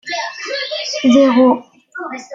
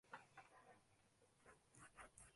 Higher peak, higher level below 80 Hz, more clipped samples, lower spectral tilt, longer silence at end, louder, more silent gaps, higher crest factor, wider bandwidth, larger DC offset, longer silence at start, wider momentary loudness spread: first, -2 dBFS vs -42 dBFS; first, -60 dBFS vs -82 dBFS; neither; about the same, -3.5 dB/octave vs -3 dB/octave; about the same, 0 s vs 0 s; first, -14 LUFS vs -65 LUFS; neither; second, 14 dB vs 24 dB; second, 7.6 kHz vs 11.5 kHz; neither; about the same, 0.05 s vs 0.05 s; first, 17 LU vs 6 LU